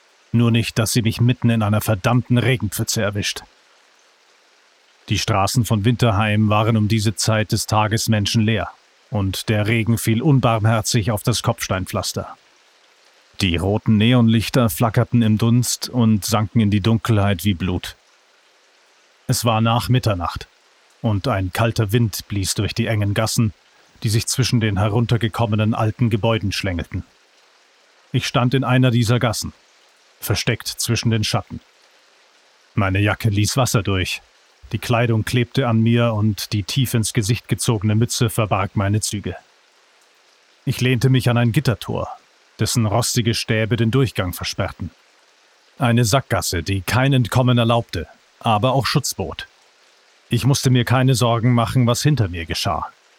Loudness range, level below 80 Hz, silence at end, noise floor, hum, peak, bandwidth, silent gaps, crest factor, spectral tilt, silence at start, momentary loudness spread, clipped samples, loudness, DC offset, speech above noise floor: 4 LU; -44 dBFS; 0.3 s; -55 dBFS; none; -4 dBFS; 16.5 kHz; none; 16 dB; -5 dB/octave; 0.35 s; 9 LU; under 0.1%; -19 LUFS; under 0.1%; 37 dB